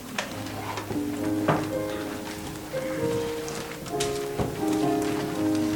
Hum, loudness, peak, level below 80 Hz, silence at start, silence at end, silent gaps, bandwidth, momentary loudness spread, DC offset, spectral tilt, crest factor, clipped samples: none; -29 LUFS; -8 dBFS; -50 dBFS; 0 s; 0 s; none; 19 kHz; 8 LU; under 0.1%; -5 dB/octave; 20 dB; under 0.1%